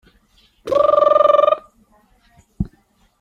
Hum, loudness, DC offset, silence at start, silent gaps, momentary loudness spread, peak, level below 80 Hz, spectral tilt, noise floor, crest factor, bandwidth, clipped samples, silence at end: none; -15 LUFS; under 0.1%; 0.65 s; none; 16 LU; -2 dBFS; -44 dBFS; -7 dB/octave; -58 dBFS; 16 dB; 7 kHz; under 0.1%; 0.55 s